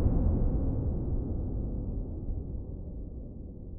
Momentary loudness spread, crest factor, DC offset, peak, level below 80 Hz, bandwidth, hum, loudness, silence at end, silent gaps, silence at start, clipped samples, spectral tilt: 14 LU; 16 dB; under 0.1%; -16 dBFS; -34 dBFS; 1.7 kHz; none; -35 LUFS; 0 s; none; 0 s; under 0.1%; -15 dB/octave